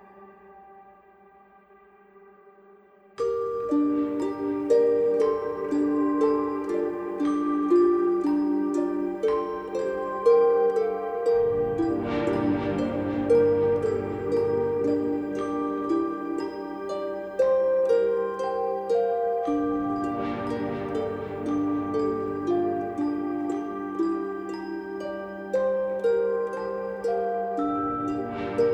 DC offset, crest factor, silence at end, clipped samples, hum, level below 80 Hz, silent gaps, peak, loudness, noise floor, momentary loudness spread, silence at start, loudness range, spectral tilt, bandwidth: under 0.1%; 16 dB; 0 s; under 0.1%; none; -58 dBFS; none; -10 dBFS; -26 LUFS; -55 dBFS; 9 LU; 0.15 s; 5 LU; -7.5 dB/octave; 8.6 kHz